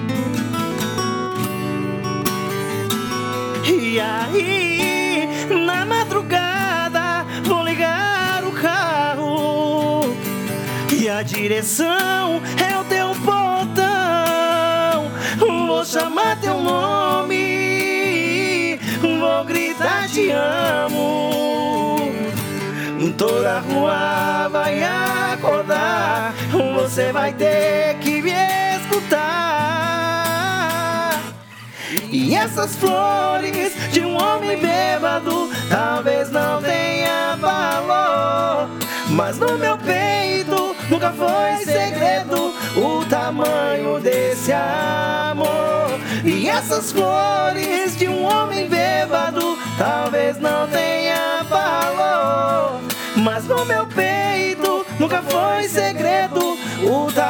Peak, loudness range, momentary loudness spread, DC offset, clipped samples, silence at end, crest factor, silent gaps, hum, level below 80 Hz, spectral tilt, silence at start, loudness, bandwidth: 0 dBFS; 2 LU; 4 LU; under 0.1%; under 0.1%; 0 s; 18 dB; none; none; -62 dBFS; -4 dB/octave; 0 s; -19 LUFS; 19 kHz